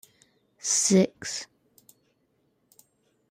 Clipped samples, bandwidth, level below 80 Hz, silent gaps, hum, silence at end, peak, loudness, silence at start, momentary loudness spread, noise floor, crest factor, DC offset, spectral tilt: under 0.1%; 15 kHz; -72 dBFS; none; none; 1.85 s; -10 dBFS; -25 LUFS; 0.65 s; 15 LU; -71 dBFS; 20 dB; under 0.1%; -3.5 dB/octave